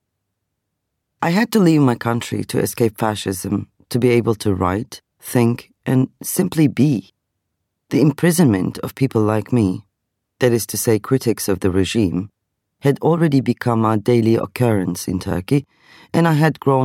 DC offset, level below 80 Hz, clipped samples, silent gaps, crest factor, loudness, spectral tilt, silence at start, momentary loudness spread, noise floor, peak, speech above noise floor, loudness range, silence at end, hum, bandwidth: under 0.1%; -52 dBFS; under 0.1%; none; 16 dB; -18 LUFS; -6.5 dB/octave; 1.2 s; 8 LU; -76 dBFS; -2 dBFS; 59 dB; 2 LU; 0 s; none; 17 kHz